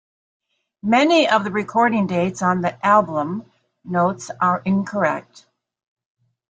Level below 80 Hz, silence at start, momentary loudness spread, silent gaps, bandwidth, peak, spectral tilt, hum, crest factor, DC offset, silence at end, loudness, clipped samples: -64 dBFS; 0.85 s; 10 LU; none; 9.2 kHz; -4 dBFS; -5.5 dB/octave; none; 18 dB; under 0.1%; 1.3 s; -19 LUFS; under 0.1%